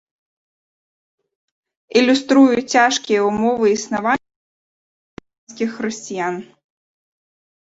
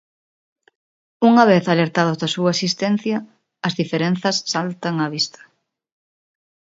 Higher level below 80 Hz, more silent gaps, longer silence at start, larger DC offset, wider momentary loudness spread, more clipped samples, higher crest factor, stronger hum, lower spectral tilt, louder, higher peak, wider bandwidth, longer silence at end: first, -60 dBFS vs -66 dBFS; first, 4.36-5.17 s, 5.38-5.47 s vs none; first, 1.95 s vs 1.2 s; neither; about the same, 12 LU vs 10 LU; neither; about the same, 20 dB vs 20 dB; neither; second, -3.5 dB/octave vs -5 dB/octave; about the same, -17 LUFS vs -19 LUFS; about the same, -2 dBFS vs 0 dBFS; about the same, 8 kHz vs 7.8 kHz; second, 1.2 s vs 1.45 s